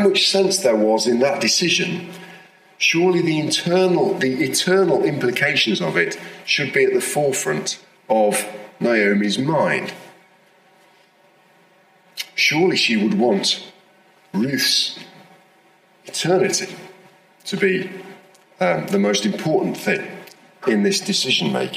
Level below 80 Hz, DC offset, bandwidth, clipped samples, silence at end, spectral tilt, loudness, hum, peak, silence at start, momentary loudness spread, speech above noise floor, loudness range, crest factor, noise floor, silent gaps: -70 dBFS; under 0.1%; 16 kHz; under 0.1%; 0 s; -3.5 dB/octave; -18 LUFS; none; -2 dBFS; 0 s; 13 LU; 36 dB; 5 LU; 18 dB; -55 dBFS; none